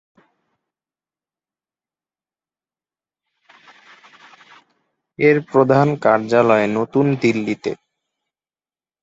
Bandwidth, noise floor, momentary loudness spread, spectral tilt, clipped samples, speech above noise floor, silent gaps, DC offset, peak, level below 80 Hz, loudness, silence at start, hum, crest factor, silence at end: 7.8 kHz; under -90 dBFS; 10 LU; -7.5 dB/octave; under 0.1%; over 74 dB; none; under 0.1%; -2 dBFS; -62 dBFS; -17 LUFS; 5.2 s; none; 20 dB; 1.3 s